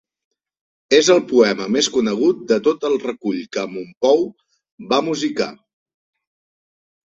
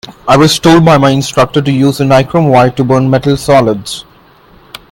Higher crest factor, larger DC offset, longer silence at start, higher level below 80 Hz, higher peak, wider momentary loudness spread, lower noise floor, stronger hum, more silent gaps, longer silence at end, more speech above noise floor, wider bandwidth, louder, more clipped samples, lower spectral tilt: first, 18 dB vs 8 dB; neither; first, 0.9 s vs 0.05 s; second, -62 dBFS vs -38 dBFS; about the same, -2 dBFS vs 0 dBFS; first, 11 LU vs 5 LU; first, under -90 dBFS vs -41 dBFS; neither; first, 3.97-4.01 s, 4.72-4.78 s vs none; first, 1.5 s vs 0.9 s; first, over 72 dB vs 34 dB; second, 8 kHz vs 17 kHz; second, -18 LUFS vs -8 LUFS; second, under 0.1% vs 0.5%; second, -3.5 dB/octave vs -6 dB/octave